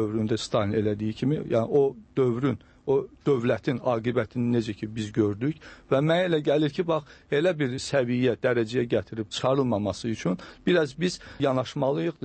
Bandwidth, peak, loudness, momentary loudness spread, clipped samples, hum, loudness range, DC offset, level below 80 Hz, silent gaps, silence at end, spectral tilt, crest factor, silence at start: 8.8 kHz; -10 dBFS; -26 LUFS; 6 LU; under 0.1%; none; 2 LU; under 0.1%; -58 dBFS; none; 0 s; -6.5 dB/octave; 16 dB; 0 s